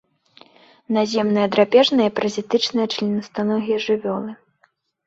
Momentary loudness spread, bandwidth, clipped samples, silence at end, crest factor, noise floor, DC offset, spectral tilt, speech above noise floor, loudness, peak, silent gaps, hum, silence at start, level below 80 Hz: 9 LU; 8 kHz; under 0.1%; 0.75 s; 18 dB; -63 dBFS; under 0.1%; -5 dB/octave; 44 dB; -20 LUFS; -2 dBFS; none; none; 0.9 s; -64 dBFS